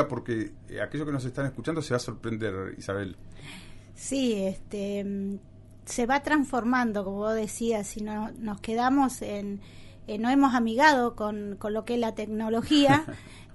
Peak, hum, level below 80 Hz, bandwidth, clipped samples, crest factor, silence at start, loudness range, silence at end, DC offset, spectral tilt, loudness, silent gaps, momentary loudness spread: -8 dBFS; none; -50 dBFS; 11.5 kHz; under 0.1%; 20 dB; 0 s; 8 LU; 0 s; under 0.1%; -5 dB/octave; -28 LUFS; none; 16 LU